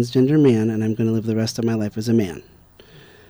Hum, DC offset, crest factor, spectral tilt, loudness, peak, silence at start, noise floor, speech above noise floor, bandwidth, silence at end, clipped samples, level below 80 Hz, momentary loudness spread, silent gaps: none; under 0.1%; 14 dB; -7 dB/octave; -20 LUFS; -6 dBFS; 0 s; -47 dBFS; 28 dB; over 20 kHz; 0.9 s; under 0.1%; -54 dBFS; 8 LU; none